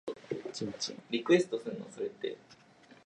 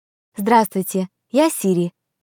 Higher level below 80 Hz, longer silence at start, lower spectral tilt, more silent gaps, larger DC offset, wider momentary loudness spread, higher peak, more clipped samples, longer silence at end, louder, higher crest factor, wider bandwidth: second, -78 dBFS vs -66 dBFS; second, 0.05 s vs 0.35 s; about the same, -4.5 dB/octave vs -5.5 dB/octave; neither; neither; first, 13 LU vs 10 LU; second, -12 dBFS vs -2 dBFS; neither; first, 0.5 s vs 0.35 s; second, -34 LUFS vs -19 LUFS; about the same, 22 dB vs 18 dB; second, 10 kHz vs 19 kHz